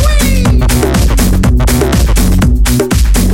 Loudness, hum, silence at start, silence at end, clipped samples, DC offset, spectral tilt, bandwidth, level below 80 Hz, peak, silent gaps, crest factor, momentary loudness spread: -10 LUFS; none; 0 s; 0 s; under 0.1%; under 0.1%; -5.5 dB/octave; 16.5 kHz; -10 dBFS; -2 dBFS; none; 6 dB; 1 LU